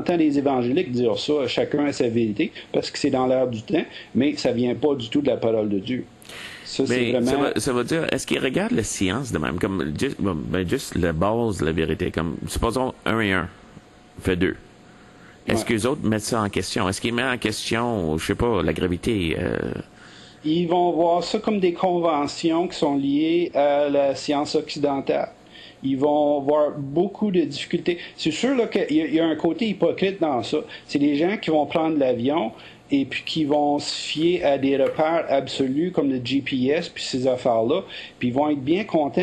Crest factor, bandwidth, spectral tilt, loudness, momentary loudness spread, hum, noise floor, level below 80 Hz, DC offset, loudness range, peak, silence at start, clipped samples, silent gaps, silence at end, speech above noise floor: 16 dB; 12.5 kHz; -5.5 dB/octave; -23 LUFS; 6 LU; none; -48 dBFS; -46 dBFS; under 0.1%; 3 LU; -6 dBFS; 0 s; under 0.1%; none; 0 s; 26 dB